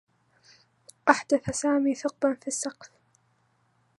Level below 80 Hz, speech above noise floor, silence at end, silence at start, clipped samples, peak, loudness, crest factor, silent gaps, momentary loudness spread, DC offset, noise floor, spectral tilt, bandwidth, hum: -64 dBFS; 43 dB; 1.1 s; 1.05 s; under 0.1%; -2 dBFS; -27 LUFS; 26 dB; none; 8 LU; under 0.1%; -69 dBFS; -4 dB/octave; 11.5 kHz; none